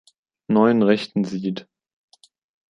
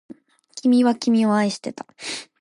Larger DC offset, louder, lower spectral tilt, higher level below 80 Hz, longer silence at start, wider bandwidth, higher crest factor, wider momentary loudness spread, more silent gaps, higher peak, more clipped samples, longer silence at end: neither; about the same, -20 LUFS vs -20 LUFS; first, -7.5 dB/octave vs -5 dB/octave; first, -66 dBFS vs -72 dBFS; about the same, 0.5 s vs 0.55 s; second, 7.6 kHz vs 11.5 kHz; first, 20 dB vs 14 dB; second, 12 LU vs 16 LU; neither; first, -4 dBFS vs -8 dBFS; neither; first, 1.1 s vs 0.2 s